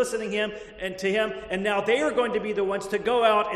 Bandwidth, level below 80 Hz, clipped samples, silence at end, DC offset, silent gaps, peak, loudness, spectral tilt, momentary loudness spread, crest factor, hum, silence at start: 13 kHz; -56 dBFS; under 0.1%; 0 s; under 0.1%; none; -8 dBFS; -25 LUFS; -4 dB/octave; 7 LU; 18 dB; none; 0 s